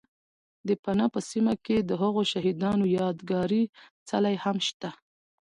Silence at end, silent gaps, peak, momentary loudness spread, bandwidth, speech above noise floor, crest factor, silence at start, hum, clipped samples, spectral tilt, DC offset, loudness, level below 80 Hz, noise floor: 0.5 s; 0.79-0.83 s, 3.69-3.73 s, 3.91-4.06 s, 4.74-4.80 s; -14 dBFS; 6 LU; 11 kHz; over 63 dB; 14 dB; 0.65 s; none; under 0.1%; -6 dB/octave; under 0.1%; -27 LUFS; -62 dBFS; under -90 dBFS